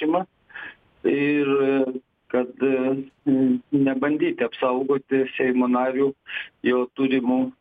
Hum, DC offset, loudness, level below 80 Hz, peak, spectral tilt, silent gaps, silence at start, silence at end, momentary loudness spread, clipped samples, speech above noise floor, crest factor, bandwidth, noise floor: none; under 0.1%; -23 LUFS; -66 dBFS; -8 dBFS; -9 dB/octave; none; 0 s; 0.1 s; 11 LU; under 0.1%; 19 dB; 14 dB; 3.9 kHz; -41 dBFS